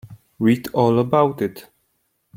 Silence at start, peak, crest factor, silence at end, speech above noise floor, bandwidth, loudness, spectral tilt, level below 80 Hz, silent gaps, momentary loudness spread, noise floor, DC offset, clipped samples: 0.05 s; -2 dBFS; 18 dB; 0.75 s; 51 dB; 16.5 kHz; -19 LUFS; -8 dB/octave; -58 dBFS; none; 9 LU; -69 dBFS; under 0.1%; under 0.1%